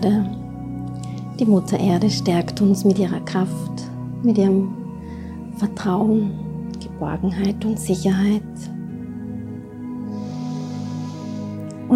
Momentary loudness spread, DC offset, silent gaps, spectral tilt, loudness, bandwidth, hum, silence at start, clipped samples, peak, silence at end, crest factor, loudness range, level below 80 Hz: 14 LU; under 0.1%; none; -7 dB/octave; -22 LUFS; 14 kHz; none; 0 s; under 0.1%; -6 dBFS; 0 s; 16 dB; 6 LU; -48 dBFS